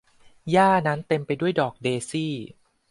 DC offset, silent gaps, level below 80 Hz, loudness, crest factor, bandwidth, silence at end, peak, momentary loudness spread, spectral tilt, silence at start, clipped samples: under 0.1%; none; -64 dBFS; -23 LUFS; 18 dB; 11.5 kHz; 0.45 s; -6 dBFS; 15 LU; -6 dB/octave; 0.45 s; under 0.1%